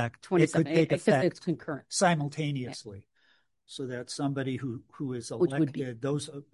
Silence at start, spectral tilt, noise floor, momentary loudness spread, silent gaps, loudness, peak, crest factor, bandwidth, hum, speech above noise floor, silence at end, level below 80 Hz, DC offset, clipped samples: 0 s; -5.5 dB/octave; -69 dBFS; 13 LU; none; -29 LUFS; -10 dBFS; 20 dB; 11.5 kHz; none; 40 dB; 0.1 s; -68 dBFS; under 0.1%; under 0.1%